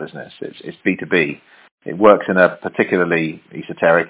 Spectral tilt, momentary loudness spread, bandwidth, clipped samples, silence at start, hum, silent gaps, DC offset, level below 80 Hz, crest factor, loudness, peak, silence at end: -9.5 dB/octave; 19 LU; 4 kHz; under 0.1%; 0 s; none; 1.71-1.78 s; under 0.1%; -58 dBFS; 18 dB; -16 LUFS; 0 dBFS; 0 s